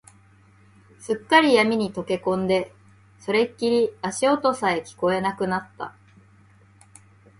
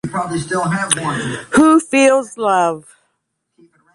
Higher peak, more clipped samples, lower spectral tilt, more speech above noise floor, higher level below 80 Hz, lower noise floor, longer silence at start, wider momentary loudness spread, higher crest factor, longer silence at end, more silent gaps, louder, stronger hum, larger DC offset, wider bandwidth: about the same, -2 dBFS vs 0 dBFS; neither; about the same, -4.5 dB/octave vs -4.5 dB/octave; second, 32 dB vs 56 dB; second, -62 dBFS vs -52 dBFS; second, -54 dBFS vs -71 dBFS; first, 1 s vs 0.05 s; first, 19 LU vs 10 LU; first, 22 dB vs 16 dB; first, 1.5 s vs 1.15 s; neither; second, -22 LUFS vs -15 LUFS; neither; neither; about the same, 11.5 kHz vs 11.5 kHz